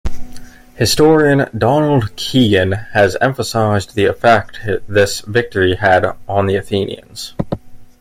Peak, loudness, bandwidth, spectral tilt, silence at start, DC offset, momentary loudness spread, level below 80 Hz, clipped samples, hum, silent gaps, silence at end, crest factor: 0 dBFS; -14 LUFS; 16 kHz; -5 dB/octave; 0.05 s; under 0.1%; 12 LU; -36 dBFS; under 0.1%; none; none; 0.15 s; 14 dB